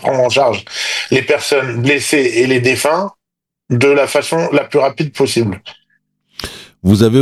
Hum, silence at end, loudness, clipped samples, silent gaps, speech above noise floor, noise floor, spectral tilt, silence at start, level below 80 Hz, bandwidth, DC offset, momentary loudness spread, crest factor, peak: none; 0 s; -14 LUFS; under 0.1%; none; 68 dB; -81 dBFS; -5 dB/octave; 0 s; -50 dBFS; 14.5 kHz; under 0.1%; 13 LU; 14 dB; 0 dBFS